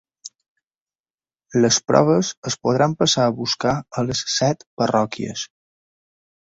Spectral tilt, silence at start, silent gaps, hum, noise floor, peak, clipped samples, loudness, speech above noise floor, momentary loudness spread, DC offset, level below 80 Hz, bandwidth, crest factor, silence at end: -4 dB/octave; 0.25 s; 0.48-0.55 s, 0.67-0.71 s, 0.81-0.87 s, 1.00-1.04 s, 1.10-1.14 s, 2.37-2.43 s, 4.67-4.77 s; none; under -90 dBFS; -2 dBFS; under 0.1%; -20 LUFS; over 70 dB; 14 LU; under 0.1%; -56 dBFS; 8.2 kHz; 20 dB; 1 s